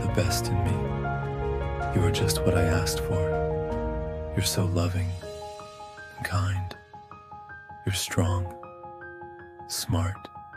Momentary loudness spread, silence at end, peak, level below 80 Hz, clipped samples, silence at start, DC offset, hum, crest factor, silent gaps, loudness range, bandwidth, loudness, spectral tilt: 19 LU; 0 s; -10 dBFS; -40 dBFS; under 0.1%; 0 s; under 0.1%; none; 18 dB; none; 6 LU; 15.5 kHz; -28 LUFS; -5 dB/octave